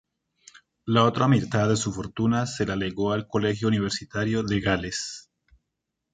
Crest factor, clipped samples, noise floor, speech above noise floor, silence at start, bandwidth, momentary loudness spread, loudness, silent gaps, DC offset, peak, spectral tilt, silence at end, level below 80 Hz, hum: 20 dB; under 0.1%; -82 dBFS; 58 dB; 0.85 s; 9.4 kHz; 9 LU; -25 LUFS; none; under 0.1%; -6 dBFS; -5.5 dB/octave; 0.9 s; -50 dBFS; none